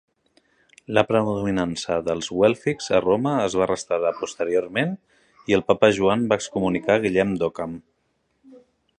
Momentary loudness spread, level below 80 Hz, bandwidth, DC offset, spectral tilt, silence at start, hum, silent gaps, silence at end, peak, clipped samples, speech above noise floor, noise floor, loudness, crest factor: 8 LU; -54 dBFS; 10.5 kHz; under 0.1%; -5.5 dB/octave; 0.9 s; none; none; 0.4 s; -2 dBFS; under 0.1%; 49 dB; -70 dBFS; -22 LUFS; 22 dB